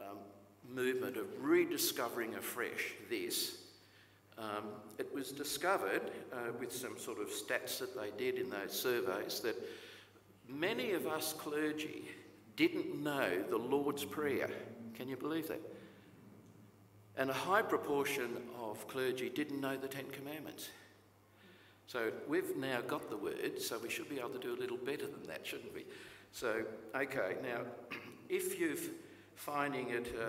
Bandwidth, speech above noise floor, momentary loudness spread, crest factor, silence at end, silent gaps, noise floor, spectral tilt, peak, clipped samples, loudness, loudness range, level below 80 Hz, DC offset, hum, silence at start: 16 kHz; 26 dB; 15 LU; 22 dB; 0 s; none; -65 dBFS; -3.5 dB/octave; -18 dBFS; under 0.1%; -39 LUFS; 5 LU; -78 dBFS; under 0.1%; none; 0 s